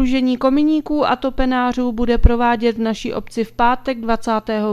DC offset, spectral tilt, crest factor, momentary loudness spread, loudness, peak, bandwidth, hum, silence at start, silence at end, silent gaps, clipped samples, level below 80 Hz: under 0.1%; -6.5 dB/octave; 16 dB; 6 LU; -18 LUFS; 0 dBFS; 12.5 kHz; none; 0 s; 0 s; none; under 0.1%; -26 dBFS